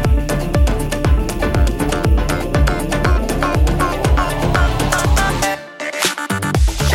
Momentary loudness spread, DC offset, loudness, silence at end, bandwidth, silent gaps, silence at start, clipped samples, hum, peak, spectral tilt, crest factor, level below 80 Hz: 3 LU; under 0.1%; -17 LUFS; 0 s; 16.5 kHz; none; 0 s; under 0.1%; none; -2 dBFS; -5 dB/octave; 12 dB; -18 dBFS